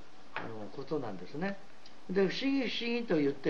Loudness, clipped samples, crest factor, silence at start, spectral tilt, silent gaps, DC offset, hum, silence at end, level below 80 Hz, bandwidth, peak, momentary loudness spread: -35 LUFS; under 0.1%; 18 dB; 0 s; -6 dB/octave; none; 0.9%; none; 0 s; -74 dBFS; 7.4 kHz; -18 dBFS; 14 LU